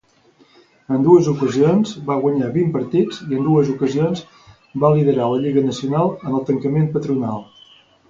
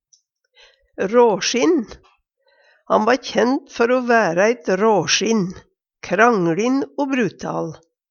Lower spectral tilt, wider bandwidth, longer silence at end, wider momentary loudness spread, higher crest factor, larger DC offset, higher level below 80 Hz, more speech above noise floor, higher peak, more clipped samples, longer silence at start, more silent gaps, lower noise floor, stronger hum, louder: first, -8 dB/octave vs -4 dB/octave; about the same, 7.6 kHz vs 7.2 kHz; first, 0.65 s vs 0.35 s; second, 8 LU vs 11 LU; about the same, 18 dB vs 20 dB; neither; about the same, -56 dBFS vs -60 dBFS; second, 37 dB vs 44 dB; about the same, 0 dBFS vs 0 dBFS; neither; about the same, 0.9 s vs 1 s; neither; second, -54 dBFS vs -61 dBFS; neither; about the same, -18 LUFS vs -18 LUFS